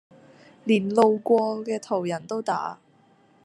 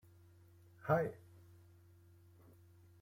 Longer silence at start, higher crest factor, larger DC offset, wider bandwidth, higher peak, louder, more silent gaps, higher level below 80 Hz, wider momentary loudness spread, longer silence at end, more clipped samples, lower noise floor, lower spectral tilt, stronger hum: second, 0.65 s vs 0.85 s; about the same, 20 dB vs 24 dB; neither; second, 11 kHz vs 16.5 kHz; first, -6 dBFS vs -22 dBFS; first, -24 LUFS vs -38 LUFS; neither; about the same, -76 dBFS vs -76 dBFS; second, 10 LU vs 27 LU; second, 0.7 s vs 1.85 s; neither; second, -59 dBFS vs -64 dBFS; second, -6 dB/octave vs -8.5 dB/octave; neither